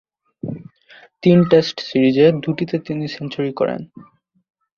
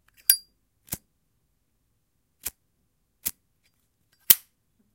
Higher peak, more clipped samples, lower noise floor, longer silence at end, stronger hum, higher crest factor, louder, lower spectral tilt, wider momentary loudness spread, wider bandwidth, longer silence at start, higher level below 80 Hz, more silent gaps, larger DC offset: about the same, 0 dBFS vs 0 dBFS; neither; second, -48 dBFS vs -74 dBFS; first, 0.75 s vs 0.6 s; neither; second, 18 dB vs 30 dB; first, -17 LUFS vs -22 LUFS; first, -7.5 dB/octave vs 1 dB/octave; about the same, 18 LU vs 19 LU; second, 7 kHz vs 17 kHz; first, 0.45 s vs 0.3 s; first, -58 dBFS vs -64 dBFS; neither; neither